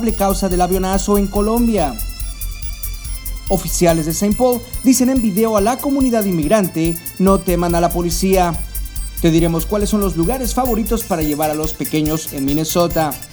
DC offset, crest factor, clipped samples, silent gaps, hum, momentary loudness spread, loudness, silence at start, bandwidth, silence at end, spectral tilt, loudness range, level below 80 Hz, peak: under 0.1%; 16 dB; under 0.1%; none; none; 11 LU; -17 LUFS; 0 s; over 20 kHz; 0.05 s; -5.5 dB/octave; 3 LU; -26 dBFS; 0 dBFS